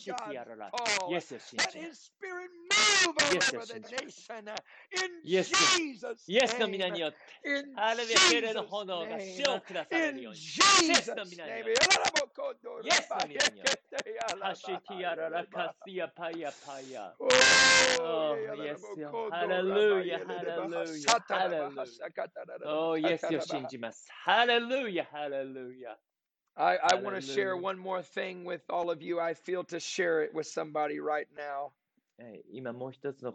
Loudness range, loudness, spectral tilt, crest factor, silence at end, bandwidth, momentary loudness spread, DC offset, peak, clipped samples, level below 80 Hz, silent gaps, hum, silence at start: 8 LU; -29 LUFS; -1.5 dB/octave; 24 dB; 0 s; 10.5 kHz; 18 LU; under 0.1%; -6 dBFS; under 0.1%; -72 dBFS; none; none; 0 s